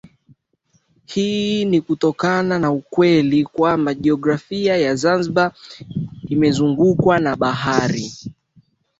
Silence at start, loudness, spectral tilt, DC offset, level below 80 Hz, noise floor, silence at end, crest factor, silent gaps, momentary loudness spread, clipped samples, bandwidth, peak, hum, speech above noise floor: 1.1 s; -18 LUFS; -6 dB/octave; under 0.1%; -52 dBFS; -63 dBFS; 0.65 s; 18 dB; none; 12 LU; under 0.1%; 8 kHz; -2 dBFS; none; 46 dB